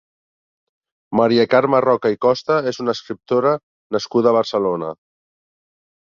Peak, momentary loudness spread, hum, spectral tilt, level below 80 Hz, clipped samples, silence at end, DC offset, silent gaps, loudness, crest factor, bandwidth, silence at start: -2 dBFS; 10 LU; none; -6 dB/octave; -62 dBFS; under 0.1%; 1.1 s; under 0.1%; 3.63-3.90 s; -18 LUFS; 18 dB; 7.2 kHz; 1.1 s